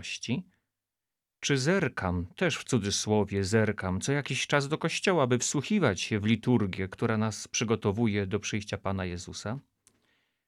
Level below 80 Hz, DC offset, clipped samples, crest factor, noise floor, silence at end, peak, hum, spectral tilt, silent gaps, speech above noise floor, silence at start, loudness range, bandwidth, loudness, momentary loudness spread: -60 dBFS; under 0.1%; under 0.1%; 20 dB; -89 dBFS; 0.9 s; -10 dBFS; none; -4.5 dB/octave; none; 61 dB; 0 s; 3 LU; 13.5 kHz; -29 LUFS; 8 LU